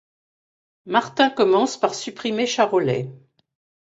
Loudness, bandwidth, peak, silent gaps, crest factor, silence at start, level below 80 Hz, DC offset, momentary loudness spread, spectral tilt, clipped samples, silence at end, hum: -21 LUFS; 8 kHz; -2 dBFS; none; 20 dB; 0.85 s; -66 dBFS; under 0.1%; 9 LU; -4.5 dB/octave; under 0.1%; 0.7 s; none